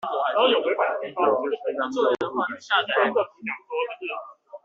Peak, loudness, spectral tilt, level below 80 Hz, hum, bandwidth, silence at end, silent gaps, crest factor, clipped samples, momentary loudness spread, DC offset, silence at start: -6 dBFS; -24 LUFS; 0 dB/octave; -74 dBFS; none; 7.4 kHz; 0.1 s; none; 18 dB; under 0.1%; 12 LU; under 0.1%; 0 s